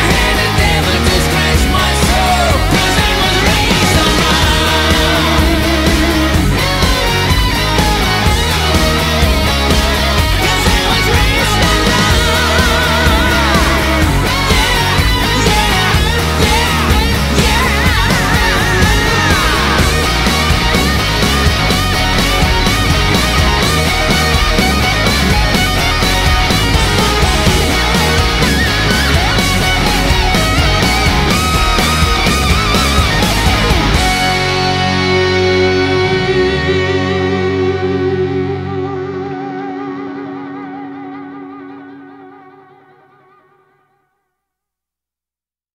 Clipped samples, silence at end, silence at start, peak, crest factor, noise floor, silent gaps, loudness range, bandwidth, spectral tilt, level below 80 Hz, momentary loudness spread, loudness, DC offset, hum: under 0.1%; 3.45 s; 0 s; 0 dBFS; 12 dB; under -90 dBFS; none; 5 LU; 16.5 kHz; -4 dB/octave; -18 dBFS; 4 LU; -11 LUFS; under 0.1%; none